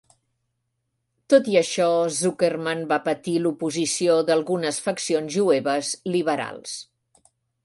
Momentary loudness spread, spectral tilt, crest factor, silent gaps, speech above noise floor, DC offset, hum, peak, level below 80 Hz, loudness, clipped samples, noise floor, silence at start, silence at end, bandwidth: 7 LU; -4 dB/octave; 20 dB; none; 54 dB; under 0.1%; none; -4 dBFS; -70 dBFS; -22 LUFS; under 0.1%; -76 dBFS; 1.3 s; 0.8 s; 11.5 kHz